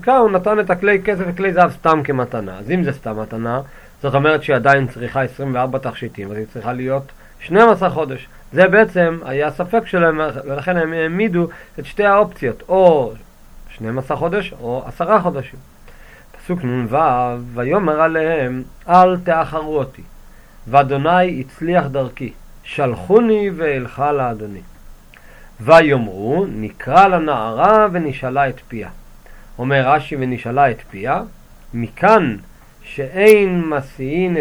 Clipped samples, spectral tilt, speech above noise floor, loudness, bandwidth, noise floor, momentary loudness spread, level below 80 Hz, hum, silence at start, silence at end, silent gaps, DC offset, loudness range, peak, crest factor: under 0.1%; -7 dB/octave; 25 dB; -16 LUFS; over 20 kHz; -41 dBFS; 15 LU; -42 dBFS; none; 0 s; 0 s; none; under 0.1%; 4 LU; 0 dBFS; 16 dB